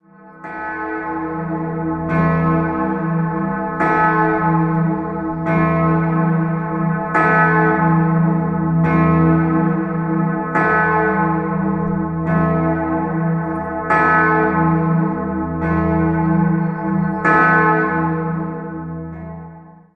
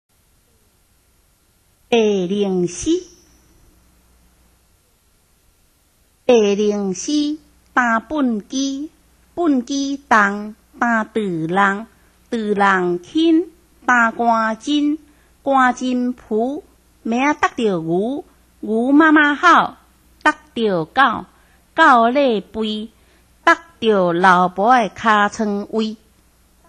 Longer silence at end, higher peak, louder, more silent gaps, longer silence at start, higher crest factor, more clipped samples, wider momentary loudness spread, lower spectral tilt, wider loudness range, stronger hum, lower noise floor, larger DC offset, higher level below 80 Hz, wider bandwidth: second, 0.25 s vs 0.75 s; about the same, -2 dBFS vs 0 dBFS; about the same, -17 LUFS vs -17 LUFS; neither; second, 0.25 s vs 1.9 s; about the same, 16 dB vs 18 dB; neither; second, 10 LU vs 13 LU; first, -10.5 dB/octave vs -4.5 dB/octave; second, 3 LU vs 6 LU; neither; second, -39 dBFS vs -58 dBFS; neither; first, -38 dBFS vs -54 dBFS; second, 4.7 kHz vs 11.5 kHz